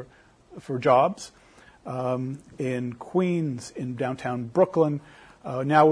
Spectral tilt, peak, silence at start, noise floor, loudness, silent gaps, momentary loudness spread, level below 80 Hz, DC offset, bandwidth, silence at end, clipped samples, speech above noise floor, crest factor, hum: -7 dB/octave; -6 dBFS; 0 s; -54 dBFS; -26 LUFS; none; 15 LU; -64 dBFS; under 0.1%; 11 kHz; 0 s; under 0.1%; 29 dB; 20 dB; none